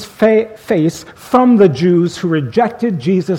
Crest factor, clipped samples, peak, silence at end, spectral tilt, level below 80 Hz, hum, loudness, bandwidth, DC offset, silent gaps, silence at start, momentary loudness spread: 12 dB; under 0.1%; 0 dBFS; 0 s; -7.5 dB/octave; -52 dBFS; none; -13 LUFS; 16 kHz; under 0.1%; none; 0 s; 8 LU